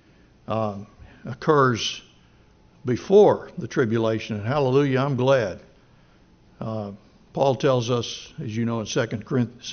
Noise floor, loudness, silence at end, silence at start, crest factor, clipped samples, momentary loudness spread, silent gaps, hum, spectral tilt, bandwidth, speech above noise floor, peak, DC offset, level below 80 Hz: -55 dBFS; -23 LUFS; 0 s; 0.5 s; 20 dB; under 0.1%; 16 LU; none; none; -5.5 dB/octave; 6.6 kHz; 33 dB; -4 dBFS; under 0.1%; -56 dBFS